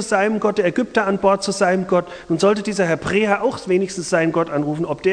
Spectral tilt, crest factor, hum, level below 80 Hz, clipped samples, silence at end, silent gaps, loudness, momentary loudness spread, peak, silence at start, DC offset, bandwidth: -5 dB/octave; 16 dB; none; -50 dBFS; under 0.1%; 0 s; none; -19 LUFS; 4 LU; -2 dBFS; 0 s; under 0.1%; 10.5 kHz